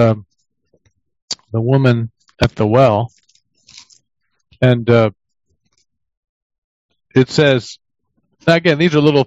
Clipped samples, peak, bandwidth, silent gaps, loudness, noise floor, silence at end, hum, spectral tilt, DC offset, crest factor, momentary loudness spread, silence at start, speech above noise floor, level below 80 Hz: under 0.1%; 0 dBFS; 8 kHz; 1.22-1.28 s, 6.17-6.23 s, 6.29-6.50 s, 6.58-6.89 s; -14 LUFS; -60 dBFS; 0 s; none; -6.5 dB/octave; under 0.1%; 16 dB; 13 LU; 0 s; 48 dB; -46 dBFS